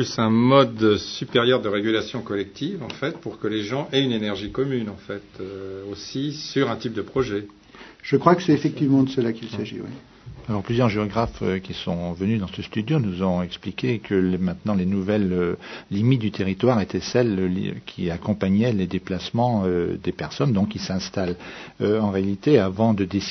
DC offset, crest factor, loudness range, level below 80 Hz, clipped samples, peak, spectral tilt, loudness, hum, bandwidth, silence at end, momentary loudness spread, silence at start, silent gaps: under 0.1%; 22 dB; 4 LU; -52 dBFS; under 0.1%; -2 dBFS; -6.5 dB/octave; -23 LUFS; none; 6.4 kHz; 0 s; 12 LU; 0 s; none